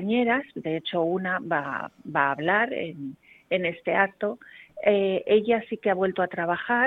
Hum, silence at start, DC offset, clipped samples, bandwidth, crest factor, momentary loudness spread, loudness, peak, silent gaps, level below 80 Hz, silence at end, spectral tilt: none; 0 s; under 0.1%; under 0.1%; 4.3 kHz; 20 dB; 10 LU; -26 LUFS; -6 dBFS; none; -66 dBFS; 0 s; -8 dB/octave